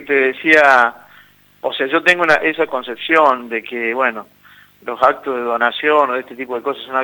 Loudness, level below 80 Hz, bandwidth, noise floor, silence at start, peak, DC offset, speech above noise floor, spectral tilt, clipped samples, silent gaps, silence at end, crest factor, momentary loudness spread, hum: -15 LUFS; -62 dBFS; over 20 kHz; -48 dBFS; 0 s; 0 dBFS; under 0.1%; 32 dB; -4 dB/octave; under 0.1%; none; 0 s; 16 dB; 12 LU; 50 Hz at -60 dBFS